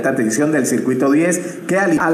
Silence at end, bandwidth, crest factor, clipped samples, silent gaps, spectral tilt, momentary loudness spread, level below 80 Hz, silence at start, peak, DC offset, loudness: 0 s; 14 kHz; 12 dB; under 0.1%; none; -5 dB/octave; 4 LU; -60 dBFS; 0 s; -4 dBFS; under 0.1%; -16 LUFS